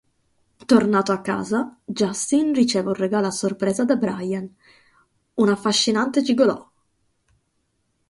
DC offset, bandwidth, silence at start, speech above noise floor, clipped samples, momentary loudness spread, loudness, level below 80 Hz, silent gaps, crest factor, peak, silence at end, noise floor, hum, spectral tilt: under 0.1%; 11.5 kHz; 0.7 s; 50 dB; under 0.1%; 10 LU; -21 LUFS; -62 dBFS; none; 20 dB; -2 dBFS; 1.5 s; -70 dBFS; none; -4.5 dB/octave